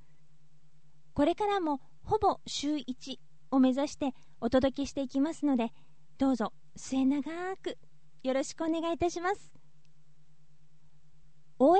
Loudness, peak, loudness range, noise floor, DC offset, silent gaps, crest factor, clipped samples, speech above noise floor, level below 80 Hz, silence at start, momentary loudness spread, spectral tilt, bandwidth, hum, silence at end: -32 LUFS; -14 dBFS; 5 LU; -66 dBFS; 0.5%; none; 18 dB; under 0.1%; 36 dB; -58 dBFS; 1.15 s; 12 LU; -5 dB/octave; 8.4 kHz; none; 0 s